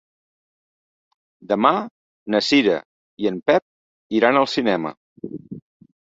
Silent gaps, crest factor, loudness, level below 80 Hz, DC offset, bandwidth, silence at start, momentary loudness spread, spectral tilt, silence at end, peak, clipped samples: 1.91-2.26 s, 2.85-3.17 s, 3.62-4.10 s, 4.97-5.16 s; 20 dB; -20 LUFS; -64 dBFS; under 0.1%; 8 kHz; 1.5 s; 20 LU; -5 dB/octave; 0.45 s; -2 dBFS; under 0.1%